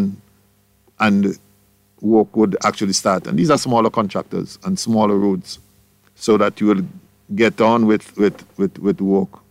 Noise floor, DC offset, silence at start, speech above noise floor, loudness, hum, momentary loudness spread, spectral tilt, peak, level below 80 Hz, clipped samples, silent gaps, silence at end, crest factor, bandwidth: -57 dBFS; under 0.1%; 0 s; 40 dB; -18 LUFS; none; 10 LU; -5.5 dB/octave; -2 dBFS; -58 dBFS; under 0.1%; none; 0.25 s; 16 dB; 15 kHz